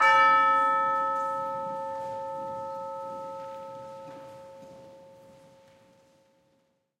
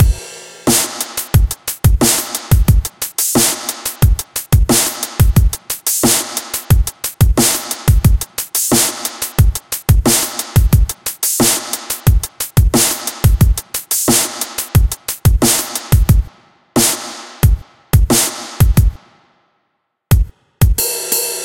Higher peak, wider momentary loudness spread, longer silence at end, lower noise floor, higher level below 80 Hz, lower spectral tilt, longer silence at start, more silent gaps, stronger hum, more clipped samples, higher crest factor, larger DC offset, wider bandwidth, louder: second, -10 dBFS vs 0 dBFS; first, 26 LU vs 8 LU; first, 1.85 s vs 0 s; about the same, -71 dBFS vs -68 dBFS; second, -76 dBFS vs -18 dBFS; about the same, -3 dB/octave vs -4 dB/octave; about the same, 0 s vs 0 s; neither; neither; neither; first, 20 dB vs 14 dB; neither; second, 12.5 kHz vs 17.5 kHz; second, -26 LUFS vs -14 LUFS